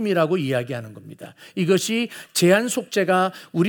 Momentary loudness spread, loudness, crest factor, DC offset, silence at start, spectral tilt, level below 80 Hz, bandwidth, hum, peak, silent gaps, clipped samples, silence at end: 21 LU; -21 LUFS; 18 dB; under 0.1%; 0 s; -4.5 dB/octave; -72 dBFS; over 20 kHz; none; -2 dBFS; none; under 0.1%; 0 s